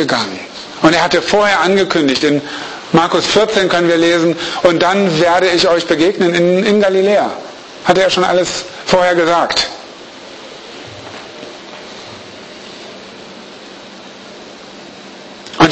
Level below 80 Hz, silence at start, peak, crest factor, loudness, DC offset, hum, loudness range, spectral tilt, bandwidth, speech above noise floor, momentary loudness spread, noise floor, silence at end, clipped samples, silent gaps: -48 dBFS; 0 s; 0 dBFS; 14 dB; -12 LUFS; under 0.1%; none; 20 LU; -4 dB/octave; 8.8 kHz; 22 dB; 22 LU; -34 dBFS; 0 s; under 0.1%; none